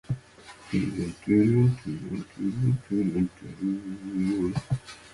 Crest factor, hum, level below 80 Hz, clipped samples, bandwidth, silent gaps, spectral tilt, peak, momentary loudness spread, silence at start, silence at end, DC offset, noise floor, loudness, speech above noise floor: 16 dB; none; -52 dBFS; under 0.1%; 11.5 kHz; none; -8.5 dB/octave; -12 dBFS; 12 LU; 0.1 s; 0.05 s; under 0.1%; -49 dBFS; -28 LUFS; 23 dB